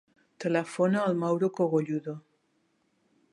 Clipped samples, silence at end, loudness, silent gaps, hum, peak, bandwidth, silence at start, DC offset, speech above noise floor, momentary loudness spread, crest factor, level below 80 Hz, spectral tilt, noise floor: under 0.1%; 1.15 s; -28 LUFS; none; none; -12 dBFS; 11.5 kHz; 0.4 s; under 0.1%; 45 dB; 10 LU; 18 dB; -80 dBFS; -7.5 dB/octave; -72 dBFS